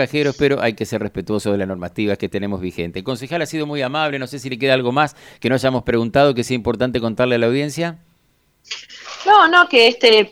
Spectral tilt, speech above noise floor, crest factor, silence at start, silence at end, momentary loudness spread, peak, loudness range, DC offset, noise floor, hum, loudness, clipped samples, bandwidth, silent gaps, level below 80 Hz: -5 dB/octave; 43 dB; 18 dB; 0 s; 0 s; 15 LU; 0 dBFS; 7 LU; under 0.1%; -61 dBFS; none; -17 LUFS; under 0.1%; 15.5 kHz; none; -48 dBFS